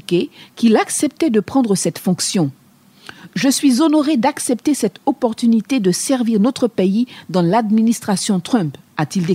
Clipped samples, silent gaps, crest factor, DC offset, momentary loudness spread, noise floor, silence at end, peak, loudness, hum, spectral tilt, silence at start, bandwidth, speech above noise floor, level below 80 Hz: under 0.1%; none; 14 dB; under 0.1%; 6 LU; -42 dBFS; 0 s; -2 dBFS; -17 LUFS; none; -5 dB/octave; 0.1 s; 16 kHz; 26 dB; -62 dBFS